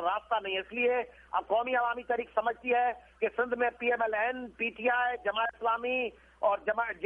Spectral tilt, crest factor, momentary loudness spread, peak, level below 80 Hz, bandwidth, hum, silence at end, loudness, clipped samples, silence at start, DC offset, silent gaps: -5.5 dB/octave; 16 dB; 5 LU; -14 dBFS; -64 dBFS; 3.7 kHz; none; 0 s; -31 LUFS; under 0.1%; 0 s; under 0.1%; none